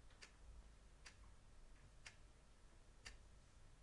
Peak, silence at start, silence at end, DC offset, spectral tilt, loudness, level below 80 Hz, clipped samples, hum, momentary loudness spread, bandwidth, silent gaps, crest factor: -42 dBFS; 0 s; 0 s; under 0.1%; -3 dB/octave; -65 LUFS; -66 dBFS; under 0.1%; none; 8 LU; 11 kHz; none; 22 dB